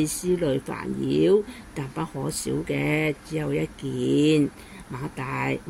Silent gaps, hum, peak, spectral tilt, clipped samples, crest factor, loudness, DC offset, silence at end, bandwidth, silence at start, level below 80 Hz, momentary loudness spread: none; none; -10 dBFS; -5.5 dB/octave; under 0.1%; 16 dB; -25 LUFS; under 0.1%; 0 s; 16 kHz; 0 s; -50 dBFS; 14 LU